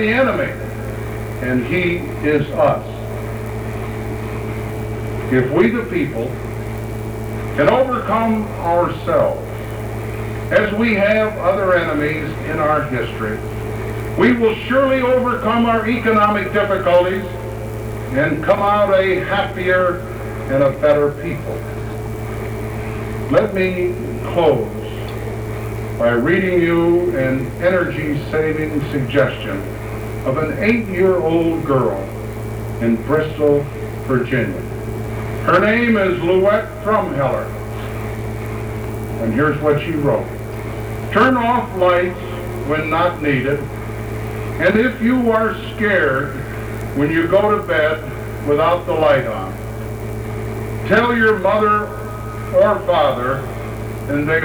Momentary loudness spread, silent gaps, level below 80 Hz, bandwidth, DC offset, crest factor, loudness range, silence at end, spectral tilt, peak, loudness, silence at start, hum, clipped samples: 12 LU; none; -34 dBFS; over 20 kHz; under 0.1%; 14 dB; 4 LU; 0 s; -7 dB/octave; -4 dBFS; -18 LUFS; 0 s; none; under 0.1%